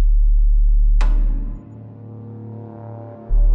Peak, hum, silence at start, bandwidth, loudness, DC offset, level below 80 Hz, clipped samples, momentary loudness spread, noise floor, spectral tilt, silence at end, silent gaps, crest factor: -6 dBFS; none; 0 s; 2.8 kHz; -21 LUFS; under 0.1%; -16 dBFS; under 0.1%; 17 LU; -36 dBFS; -8.5 dB/octave; 0 s; none; 10 dB